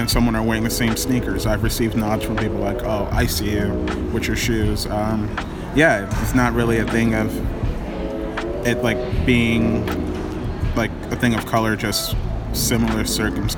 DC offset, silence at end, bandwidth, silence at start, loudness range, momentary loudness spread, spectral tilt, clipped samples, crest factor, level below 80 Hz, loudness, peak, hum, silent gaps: under 0.1%; 0 s; 19 kHz; 0 s; 2 LU; 8 LU; -5 dB/octave; under 0.1%; 18 dB; -28 dBFS; -21 LUFS; -2 dBFS; none; none